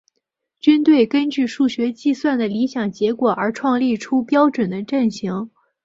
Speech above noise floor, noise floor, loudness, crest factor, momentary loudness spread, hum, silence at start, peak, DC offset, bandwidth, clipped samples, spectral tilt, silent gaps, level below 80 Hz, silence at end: 58 dB; -75 dBFS; -19 LUFS; 16 dB; 7 LU; none; 0.65 s; -2 dBFS; under 0.1%; 7.8 kHz; under 0.1%; -6 dB/octave; none; -62 dBFS; 0.35 s